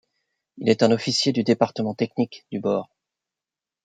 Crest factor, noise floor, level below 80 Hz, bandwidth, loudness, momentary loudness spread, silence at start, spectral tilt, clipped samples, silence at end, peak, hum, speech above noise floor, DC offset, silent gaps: 22 dB; -89 dBFS; -68 dBFS; 9.4 kHz; -23 LUFS; 8 LU; 0.55 s; -5 dB/octave; under 0.1%; 1 s; -2 dBFS; none; 67 dB; under 0.1%; none